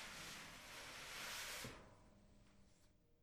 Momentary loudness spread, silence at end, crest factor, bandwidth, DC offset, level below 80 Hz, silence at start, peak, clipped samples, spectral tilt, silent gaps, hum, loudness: 15 LU; 0 s; 18 dB; over 20 kHz; under 0.1%; -70 dBFS; 0 s; -38 dBFS; under 0.1%; -1.5 dB/octave; none; none; -51 LUFS